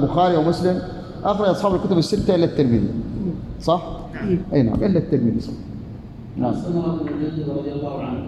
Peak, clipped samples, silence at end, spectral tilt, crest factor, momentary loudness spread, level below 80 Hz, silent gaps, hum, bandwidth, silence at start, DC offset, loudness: -4 dBFS; under 0.1%; 0 s; -8 dB/octave; 16 dB; 14 LU; -40 dBFS; none; none; 12.5 kHz; 0 s; under 0.1%; -21 LUFS